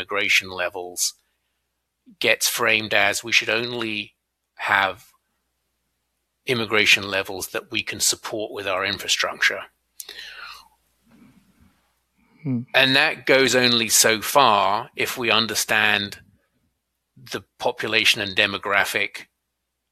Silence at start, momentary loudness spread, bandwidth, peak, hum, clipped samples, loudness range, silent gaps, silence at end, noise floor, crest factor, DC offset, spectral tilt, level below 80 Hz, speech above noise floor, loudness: 0 s; 18 LU; 15.5 kHz; -2 dBFS; none; under 0.1%; 8 LU; none; 0.7 s; -78 dBFS; 22 dB; under 0.1%; -1.5 dB/octave; -62 dBFS; 56 dB; -20 LUFS